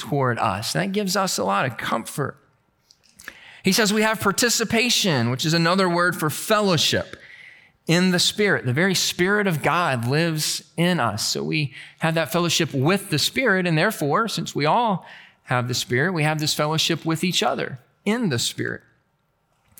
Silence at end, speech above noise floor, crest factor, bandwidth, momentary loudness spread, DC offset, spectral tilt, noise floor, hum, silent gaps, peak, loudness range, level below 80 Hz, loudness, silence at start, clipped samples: 1.05 s; 47 dB; 18 dB; 19 kHz; 9 LU; under 0.1%; -4 dB/octave; -68 dBFS; none; none; -6 dBFS; 4 LU; -62 dBFS; -21 LUFS; 0 s; under 0.1%